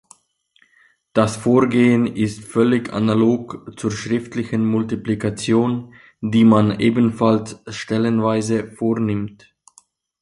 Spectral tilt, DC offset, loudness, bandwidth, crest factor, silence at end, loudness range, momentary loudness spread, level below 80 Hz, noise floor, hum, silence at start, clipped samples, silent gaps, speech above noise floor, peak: -6.5 dB/octave; under 0.1%; -19 LUFS; 11.5 kHz; 18 dB; 0.9 s; 3 LU; 10 LU; -52 dBFS; -61 dBFS; none; 1.15 s; under 0.1%; none; 43 dB; -2 dBFS